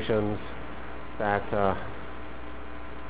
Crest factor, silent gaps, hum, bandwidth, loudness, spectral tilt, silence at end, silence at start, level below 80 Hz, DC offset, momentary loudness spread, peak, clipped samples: 24 dB; none; none; 4 kHz; -32 LUFS; -5 dB/octave; 0 s; 0 s; -46 dBFS; 2%; 14 LU; -8 dBFS; under 0.1%